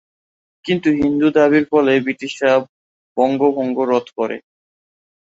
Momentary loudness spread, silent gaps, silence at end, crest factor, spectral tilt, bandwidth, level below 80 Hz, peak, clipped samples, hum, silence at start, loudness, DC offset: 10 LU; 2.69-3.16 s; 0.95 s; 16 dB; -6.5 dB/octave; 7.8 kHz; -54 dBFS; -2 dBFS; under 0.1%; none; 0.65 s; -17 LUFS; under 0.1%